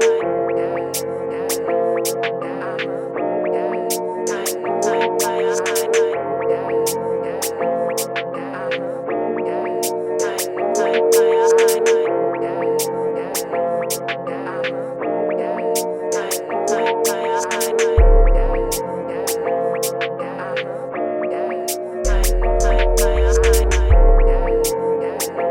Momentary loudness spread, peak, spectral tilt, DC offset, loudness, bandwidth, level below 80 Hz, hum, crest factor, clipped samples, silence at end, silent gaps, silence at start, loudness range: 9 LU; -2 dBFS; -4.5 dB/octave; under 0.1%; -19 LUFS; 16.5 kHz; -22 dBFS; none; 16 dB; under 0.1%; 0 s; none; 0 s; 5 LU